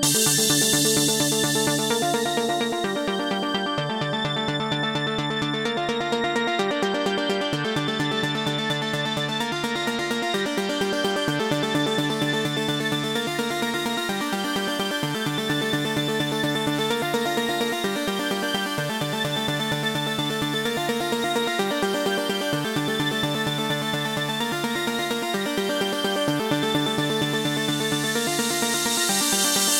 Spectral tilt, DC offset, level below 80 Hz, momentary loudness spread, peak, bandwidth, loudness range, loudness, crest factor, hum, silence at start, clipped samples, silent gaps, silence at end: -3 dB/octave; under 0.1%; -58 dBFS; 5 LU; -8 dBFS; 17.5 kHz; 2 LU; -23 LUFS; 16 dB; none; 0 s; under 0.1%; none; 0 s